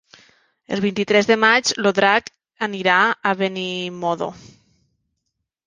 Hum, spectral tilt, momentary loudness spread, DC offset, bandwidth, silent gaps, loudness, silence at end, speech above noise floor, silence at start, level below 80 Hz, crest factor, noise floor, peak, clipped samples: none; -3.5 dB/octave; 12 LU; under 0.1%; 10 kHz; none; -18 LUFS; 1.3 s; 58 dB; 0.7 s; -62 dBFS; 20 dB; -77 dBFS; -2 dBFS; under 0.1%